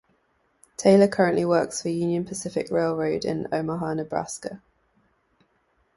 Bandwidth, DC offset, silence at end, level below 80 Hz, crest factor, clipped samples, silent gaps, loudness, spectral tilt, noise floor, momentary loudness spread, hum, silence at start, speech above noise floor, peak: 11.5 kHz; under 0.1%; 1.4 s; -60 dBFS; 20 dB; under 0.1%; none; -24 LUFS; -5.5 dB/octave; -68 dBFS; 15 LU; none; 0.8 s; 45 dB; -4 dBFS